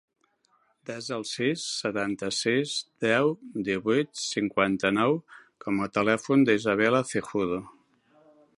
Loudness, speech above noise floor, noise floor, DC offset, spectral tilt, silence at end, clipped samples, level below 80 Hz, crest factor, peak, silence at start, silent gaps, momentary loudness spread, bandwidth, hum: -27 LUFS; 42 dB; -68 dBFS; under 0.1%; -4.5 dB/octave; 0.9 s; under 0.1%; -64 dBFS; 20 dB; -8 dBFS; 0.9 s; none; 10 LU; 11.5 kHz; none